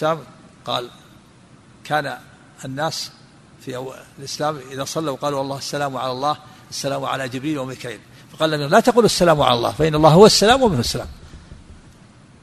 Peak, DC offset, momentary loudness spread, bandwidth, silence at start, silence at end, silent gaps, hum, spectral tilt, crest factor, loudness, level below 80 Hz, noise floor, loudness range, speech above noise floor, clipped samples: 0 dBFS; under 0.1%; 20 LU; 13.5 kHz; 0 s; 0.7 s; none; none; -4.5 dB/octave; 20 dB; -18 LUFS; -44 dBFS; -48 dBFS; 13 LU; 30 dB; under 0.1%